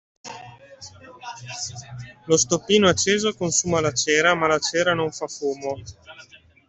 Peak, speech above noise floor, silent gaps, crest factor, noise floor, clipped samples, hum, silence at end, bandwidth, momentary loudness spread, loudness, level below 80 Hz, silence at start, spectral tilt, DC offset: -4 dBFS; 22 dB; none; 20 dB; -44 dBFS; under 0.1%; none; 0.3 s; 8.4 kHz; 22 LU; -21 LUFS; -58 dBFS; 0.25 s; -3 dB/octave; under 0.1%